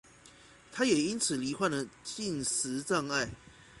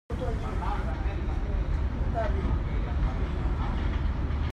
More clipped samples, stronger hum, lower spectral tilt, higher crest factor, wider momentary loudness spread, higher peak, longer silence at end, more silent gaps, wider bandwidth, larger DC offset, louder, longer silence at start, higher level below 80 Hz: neither; neither; second, -3 dB/octave vs -8 dB/octave; first, 20 dB vs 12 dB; first, 11 LU vs 3 LU; about the same, -14 dBFS vs -16 dBFS; about the same, 0 s vs 0 s; neither; first, 11.5 kHz vs 7 kHz; neither; about the same, -32 LUFS vs -31 LUFS; first, 0.25 s vs 0.1 s; second, -64 dBFS vs -30 dBFS